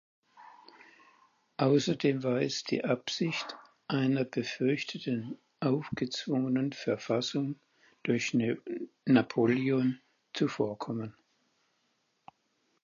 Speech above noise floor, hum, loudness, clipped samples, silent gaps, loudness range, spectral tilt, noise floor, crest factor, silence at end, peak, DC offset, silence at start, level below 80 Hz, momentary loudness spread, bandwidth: 46 dB; none; -31 LUFS; under 0.1%; none; 3 LU; -6 dB/octave; -76 dBFS; 20 dB; 1.7 s; -12 dBFS; under 0.1%; 0.4 s; -74 dBFS; 12 LU; 7.4 kHz